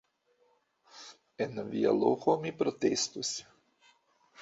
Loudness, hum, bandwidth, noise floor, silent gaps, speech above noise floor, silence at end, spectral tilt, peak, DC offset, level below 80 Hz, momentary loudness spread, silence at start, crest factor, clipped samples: -31 LUFS; none; 8 kHz; -71 dBFS; none; 41 dB; 0 s; -4 dB/octave; -12 dBFS; under 0.1%; -74 dBFS; 22 LU; 0.95 s; 22 dB; under 0.1%